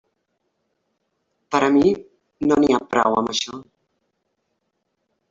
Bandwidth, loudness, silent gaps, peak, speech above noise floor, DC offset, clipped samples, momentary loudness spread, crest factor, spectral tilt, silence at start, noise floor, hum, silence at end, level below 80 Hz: 7.8 kHz; -19 LUFS; none; -4 dBFS; 56 dB; under 0.1%; under 0.1%; 12 LU; 20 dB; -4.5 dB/octave; 1.5 s; -74 dBFS; none; 1.7 s; -56 dBFS